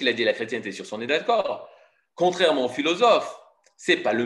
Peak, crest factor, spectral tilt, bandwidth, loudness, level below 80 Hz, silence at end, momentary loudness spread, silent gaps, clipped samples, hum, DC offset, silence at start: -6 dBFS; 18 dB; -3.5 dB/octave; 11.5 kHz; -23 LUFS; -76 dBFS; 0 s; 13 LU; none; under 0.1%; none; under 0.1%; 0 s